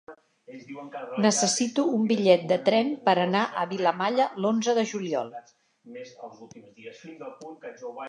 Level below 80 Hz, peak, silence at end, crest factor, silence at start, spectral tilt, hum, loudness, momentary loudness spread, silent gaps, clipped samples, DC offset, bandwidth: -80 dBFS; -6 dBFS; 0 s; 20 dB; 0.1 s; -4 dB/octave; none; -24 LUFS; 22 LU; none; under 0.1%; under 0.1%; 11 kHz